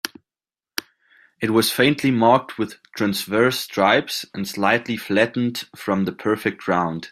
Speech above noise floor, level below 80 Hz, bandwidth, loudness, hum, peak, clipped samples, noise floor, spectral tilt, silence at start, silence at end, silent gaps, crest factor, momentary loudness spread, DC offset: over 70 dB; -62 dBFS; 16 kHz; -21 LUFS; none; -2 dBFS; under 0.1%; under -90 dBFS; -4.5 dB/octave; 0.05 s; 0.05 s; none; 20 dB; 12 LU; under 0.1%